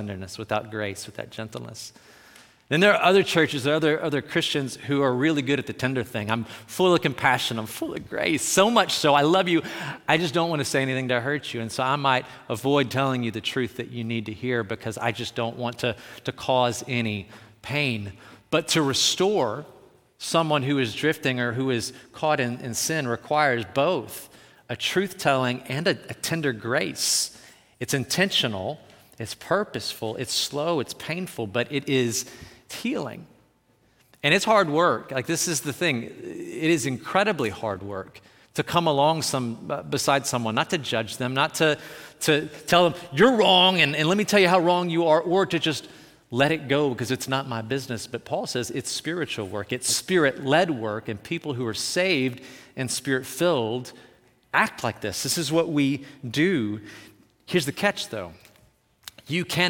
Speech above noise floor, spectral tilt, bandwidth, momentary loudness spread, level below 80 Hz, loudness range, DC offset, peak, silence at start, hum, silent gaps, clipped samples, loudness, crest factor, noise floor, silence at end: 39 dB; -4 dB/octave; 18 kHz; 13 LU; -64 dBFS; 6 LU; under 0.1%; -6 dBFS; 0 s; none; none; under 0.1%; -24 LUFS; 20 dB; -63 dBFS; 0 s